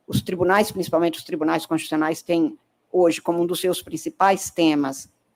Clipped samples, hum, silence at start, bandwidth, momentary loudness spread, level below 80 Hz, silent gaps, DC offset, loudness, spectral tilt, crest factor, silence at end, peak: under 0.1%; none; 0.1 s; 16.5 kHz; 7 LU; -58 dBFS; none; under 0.1%; -22 LUFS; -5 dB/octave; 16 dB; 0.3 s; -6 dBFS